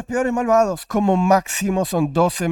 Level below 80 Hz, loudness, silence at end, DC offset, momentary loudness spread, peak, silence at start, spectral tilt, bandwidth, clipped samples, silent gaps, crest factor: -46 dBFS; -19 LUFS; 0 s; under 0.1%; 4 LU; -4 dBFS; 0 s; -5.5 dB/octave; 17.5 kHz; under 0.1%; none; 14 dB